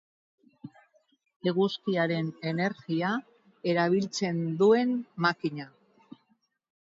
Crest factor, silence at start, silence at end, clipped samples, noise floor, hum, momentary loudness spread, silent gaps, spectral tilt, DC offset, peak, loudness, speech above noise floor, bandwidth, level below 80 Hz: 20 dB; 0.65 s; 1.25 s; under 0.1%; -72 dBFS; none; 11 LU; 1.36-1.40 s; -6 dB/octave; under 0.1%; -10 dBFS; -28 LUFS; 44 dB; 7.8 kHz; -76 dBFS